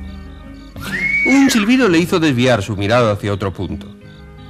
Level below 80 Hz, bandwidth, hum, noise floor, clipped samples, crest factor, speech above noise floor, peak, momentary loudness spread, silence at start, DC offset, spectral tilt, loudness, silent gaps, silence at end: -40 dBFS; 14.5 kHz; none; -37 dBFS; under 0.1%; 14 dB; 22 dB; -2 dBFS; 20 LU; 0 s; under 0.1%; -5.5 dB/octave; -14 LUFS; none; 0 s